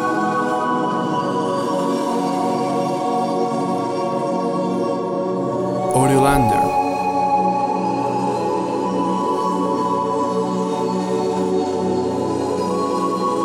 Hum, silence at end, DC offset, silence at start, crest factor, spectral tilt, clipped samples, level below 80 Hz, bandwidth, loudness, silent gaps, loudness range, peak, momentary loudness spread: none; 0 s; under 0.1%; 0 s; 16 dB; -6 dB/octave; under 0.1%; -46 dBFS; 16.5 kHz; -20 LUFS; none; 3 LU; -4 dBFS; 4 LU